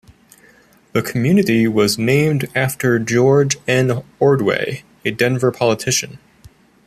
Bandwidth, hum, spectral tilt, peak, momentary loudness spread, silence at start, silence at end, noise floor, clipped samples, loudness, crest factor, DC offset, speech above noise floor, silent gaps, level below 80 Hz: 15 kHz; none; -5 dB/octave; -2 dBFS; 8 LU; 0.95 s; 0.7 s; -50 dBFS; under 0.1%; -16 LUFS; 14 dB; under 0.1%; 34 dB; none; -54 dBFS